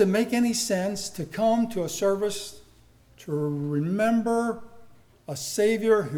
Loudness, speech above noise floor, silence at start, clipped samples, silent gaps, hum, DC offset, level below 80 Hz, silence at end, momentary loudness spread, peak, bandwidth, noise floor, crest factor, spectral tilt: -26 LUFS; 31 dB; 0 s; under 0.1%; none; none; under 0.1%; -60 dBFS; 0 s; 12 LU; -8 dBFS; 19.5 kHz; -56 dBFS; 18 dB; -5 dB/octave